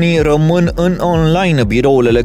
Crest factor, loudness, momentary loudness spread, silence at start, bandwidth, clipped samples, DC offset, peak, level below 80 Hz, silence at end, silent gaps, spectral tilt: 10 dB; -12 LUFS; 2 LU; 0 s; 13.5 kHz; under 0.1%; under 0.1%; 0 dBFS; -28 dBFS; 0 s; none; -7 dB/octave